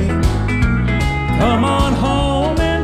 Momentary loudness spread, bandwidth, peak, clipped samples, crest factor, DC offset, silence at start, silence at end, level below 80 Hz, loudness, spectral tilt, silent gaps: 3 LU; 13.5 kHz; -4 dBFS; under 0.1%; 12 dB; under 0.1%; 0 s; 0 s; -22 dBFS; -16 LUFS; -6.5 dB/octave; none